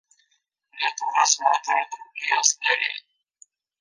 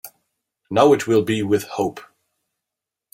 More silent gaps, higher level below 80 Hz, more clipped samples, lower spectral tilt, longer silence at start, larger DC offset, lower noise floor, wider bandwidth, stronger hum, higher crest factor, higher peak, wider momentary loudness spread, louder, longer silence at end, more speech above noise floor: neither; second, under -90 dBFS vs -62 dBFS; neither; second, 6 dB/octave vs -5.5 dB/octave; first, 0.75 s vs 0.05 s; neither; second, -71 dBFS vs -85 dBFS; second, 10.5 kHz vs 16 kHz; neither; about the same, 24 dB vs 20 dB; about the same, -2 dBFS vs -2 dBFS; about the same, 10 LU vs 10 LU; second, -22 LUFS vs -19 LUFS; second, 0.8 s vs 1.1 s; second, 48 dB vs 67 dB